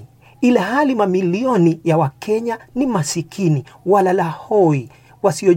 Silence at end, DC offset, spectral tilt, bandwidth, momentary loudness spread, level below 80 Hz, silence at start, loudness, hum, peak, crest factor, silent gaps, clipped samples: 0 s; under 0.1%; -6.5 dB/octave; 16.5 kHz; 6 LU; -56 dBFS; 0 s; -17 LUFS; none; -2 dBFS; 16 dB; none; under 0.1%